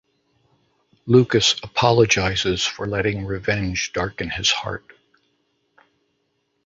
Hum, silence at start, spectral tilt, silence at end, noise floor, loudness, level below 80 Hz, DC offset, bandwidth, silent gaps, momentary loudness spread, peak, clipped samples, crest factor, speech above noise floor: none; 1.05 s; -4 dB/octave; 1.9 s; -71 dBFS; -20 LUFS; -44 dBFS; under 0.1%; 8 kHz; none; 9 LU; -2 dBFS; under 0.1%; 20 dB; 50 dB